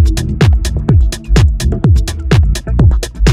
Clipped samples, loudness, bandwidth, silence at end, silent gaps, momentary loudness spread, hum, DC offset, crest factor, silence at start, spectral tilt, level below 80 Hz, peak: under 0.1%; -12 LUFS; 14 kHz; 0 s; none; 2 LU; none; under 0.1%; 10 dB; 0 s; -6 dB/octave; -12 dBFS; 0 dBFS